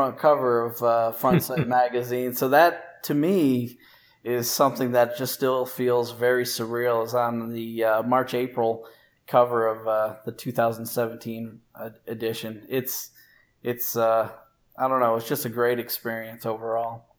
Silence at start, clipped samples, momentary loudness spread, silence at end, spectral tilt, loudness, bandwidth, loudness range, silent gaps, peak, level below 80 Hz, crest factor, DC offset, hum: 0 s; under 0.1%; 12 LU; 0.2 s; -5 dB/octave; -24 LUFS; over 20 kHz; 6 LU; none; -4 dBFS; -66 dBFS; 20 dB; under 0.1%; none